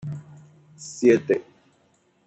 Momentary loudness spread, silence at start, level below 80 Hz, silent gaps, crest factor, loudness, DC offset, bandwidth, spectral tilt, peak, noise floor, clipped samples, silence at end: 20 LU; 0.05 s; -70 dBFS; none; 20 dB; -21 LUFS; under 0.1%; 8.4 kHz; -6 dB/octave; -6 dBFS; -64 dBFS; under 0.1%; 0.85 s